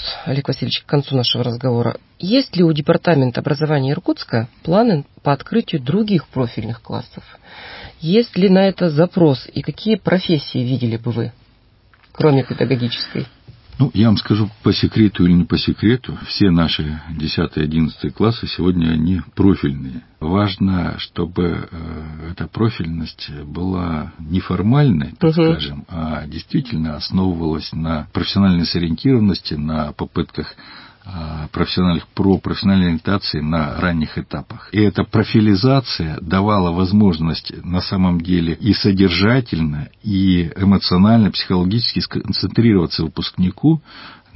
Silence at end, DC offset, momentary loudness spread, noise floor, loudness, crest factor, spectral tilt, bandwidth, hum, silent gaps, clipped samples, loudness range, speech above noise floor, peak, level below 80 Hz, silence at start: 0.2 s; under 0.1%; 12 LU; -52 dBFS; -17 LUFS; 16 dB; -10.5 dB/octave; 5.8 kHz; none; none; under 0.1%; 5 LU; 35 dB; -2 dBFS; -36 dBFS; 0 s